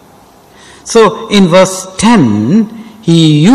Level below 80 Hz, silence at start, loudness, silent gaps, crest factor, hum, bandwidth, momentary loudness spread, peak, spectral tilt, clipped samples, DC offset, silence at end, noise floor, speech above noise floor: -42 dBFS; 0.85 s; -8 LUFS; none; 8 dB; none; 14 kHz; 8 LU; 0 dBFS; -5.5 dB/octave; 0.2%; under 0.1%; 0 s; -40 dBFS; 33 dB